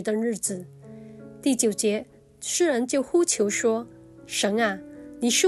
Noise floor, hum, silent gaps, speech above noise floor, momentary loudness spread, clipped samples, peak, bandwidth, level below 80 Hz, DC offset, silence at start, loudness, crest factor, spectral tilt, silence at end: -43 dBFS; none; none; 19 dB; 21 LU; under 0.1%; -8 dBFS; 13 kHz; -66 dBFS; under 0.1%; 0 s; -25 LUFS; 18 dB; -2.5 dB/octave; 0 s